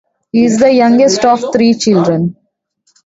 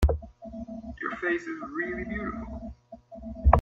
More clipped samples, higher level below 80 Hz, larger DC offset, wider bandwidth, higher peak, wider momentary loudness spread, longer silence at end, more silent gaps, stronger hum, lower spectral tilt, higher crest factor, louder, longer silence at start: neither; second, -52 dBFS vs -32 dBFS; neither; about the same, 8 kHz vs 7.6 kHz; about the same, 0 dBFS vs -2 dBFS; second, 8 LU vs 15 LU; first, 0.75 s vs 0 s; neither; neither; second, -5.5 dB/octave vs -8 dB/octave; second, 10 dB vs 26 dB; first, -10 LUFS vs -32 LUFS; first, 0.35 s vs 0 s